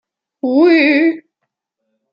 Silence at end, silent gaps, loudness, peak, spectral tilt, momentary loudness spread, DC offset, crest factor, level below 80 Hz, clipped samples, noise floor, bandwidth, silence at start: 0.95 s; none; -12 LUFS; -2 dBFS; -5.5 dB/octave; 14 LU; under 0.1%; 14 dB; -68 dBFS; under 0.1%; -75 dBFS; 5.6 kHz; 0.45 s